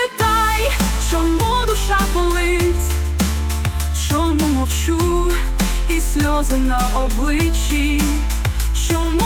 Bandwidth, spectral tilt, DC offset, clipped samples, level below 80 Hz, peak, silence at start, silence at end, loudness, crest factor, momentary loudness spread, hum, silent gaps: 18.5 kHz; -4.5 dB/octave; under 0.1%; under 0.1%; -20 dBFS; -6 dBFS; 0 s; 0 s; -18 LUFS; 10 dB; 4 LU; none; none